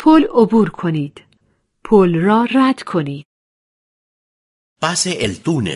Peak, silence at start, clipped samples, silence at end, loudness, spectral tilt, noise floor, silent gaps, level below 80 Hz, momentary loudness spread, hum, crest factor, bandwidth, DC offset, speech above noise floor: 0 dBFS; 0 s; under 0.1%; 0 s; -15 LUFS; -5.5 dB/octave; -62 dBFS; 3.25-4.76 s; -50 dBFS; 11 LU; none; 16 dB; 11.5 kHz; under 0.1%; 48 dB